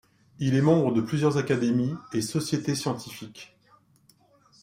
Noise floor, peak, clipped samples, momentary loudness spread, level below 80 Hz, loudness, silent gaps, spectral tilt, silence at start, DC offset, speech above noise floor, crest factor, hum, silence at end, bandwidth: -62 dBFS; -8 dBFS; under 0.1%; 18 LU; -64 dBFS; -26 LUFS; none; -6 dB/octave; 0.4 s; under 0.1%; 36 dB; 18 dB; none; 1.15 s; 16 kHz